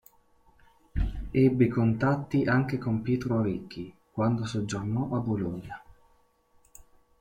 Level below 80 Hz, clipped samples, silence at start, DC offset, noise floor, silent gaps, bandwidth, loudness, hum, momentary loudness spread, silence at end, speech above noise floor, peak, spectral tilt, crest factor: -44 dBFS; under 0.1%; 0.95 s; under 0.1%; -65 dBFS; none; 15.5 kHz; -28 LUFS; none; 15 LU; 0.4 s; 38 dB; -10 dBFS; -8 dB/octave; 18 dB